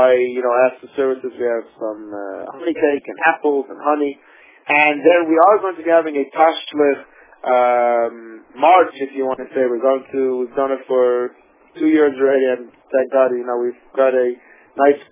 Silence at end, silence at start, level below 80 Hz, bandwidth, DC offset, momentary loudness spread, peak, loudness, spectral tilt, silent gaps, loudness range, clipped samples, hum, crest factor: 0.1 s; 0 s; -72 dBFS; 3.7 kHz; under 0.1%; 13 LU; 0 dBFS; -17 LUFS; -8 dB/octave; none; 4 LU; under 0.1%; none; 16 dB